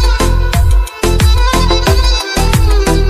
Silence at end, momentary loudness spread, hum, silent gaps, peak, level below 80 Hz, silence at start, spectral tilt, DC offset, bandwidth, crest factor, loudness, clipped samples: 0 s; 3 LU; none; none; 0 dBFS; -12 dBFS; 0 s; -4.5 dB/octave; under 0.1%; 15.5 kHz; 10 dB; -12 LUFS; under 0.1%